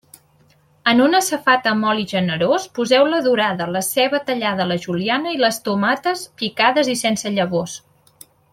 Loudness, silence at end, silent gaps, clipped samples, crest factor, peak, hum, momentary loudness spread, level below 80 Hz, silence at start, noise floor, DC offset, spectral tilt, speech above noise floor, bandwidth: -18 LUFS; 0.75 s; none; under 0.1%; 18 dB; -2 dBFS; none; 6 LU; -62 dBFS; 0.85 s; -56 dBFS; under 0.1%; -4 dB/octave; 38 dB; 16.5 kHz